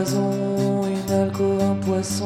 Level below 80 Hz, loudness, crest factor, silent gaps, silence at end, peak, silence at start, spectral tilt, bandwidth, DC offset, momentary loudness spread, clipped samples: -56 dBFS; -22 LUFS; 12 dB; none; 0 s; -10 dBFS; 0 s; -6 dB/octave; 15 kHz; under 0.1%; 2 LU; under 0.1%